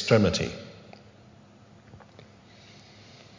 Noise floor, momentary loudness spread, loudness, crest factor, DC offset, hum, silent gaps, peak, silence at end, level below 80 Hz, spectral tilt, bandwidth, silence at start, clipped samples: -53 dBFS; 29 LU; -25 LUFS; 24 dB; under 0.1%; none; none; -6 dBFS; 1.45 s; -52 dBFS; -5.5 dB/octave; 7.6 kHz; 0 s; under 0.1%